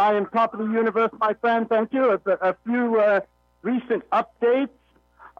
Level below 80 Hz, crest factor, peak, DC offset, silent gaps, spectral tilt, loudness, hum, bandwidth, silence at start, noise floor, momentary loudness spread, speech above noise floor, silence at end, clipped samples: -66 dBFS; 12 dB; -10 dBFS; under 0.1%; none; -7.5 dB/octave; -22 LUFS; none; 6 kHz; 0 s; -52 dBFS; 5 LU; 30 dB; 0.7 s; under 0.1%